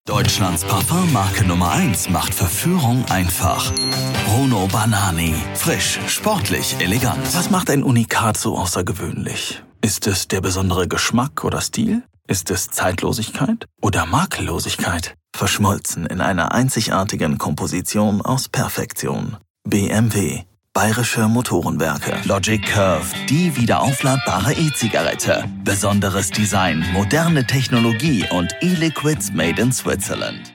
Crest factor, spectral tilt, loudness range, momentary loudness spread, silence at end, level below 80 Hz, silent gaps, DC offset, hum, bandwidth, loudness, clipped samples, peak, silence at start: 16 dB; -4.5 dB/octave; 3 LU; 5 LU; 0 s; -40 dBFS; 19.50-19.55 s; under 0.1%; none; 17.5 kHz; -18 LUFS; under 0.1%; -2 dBFS; 0.05 s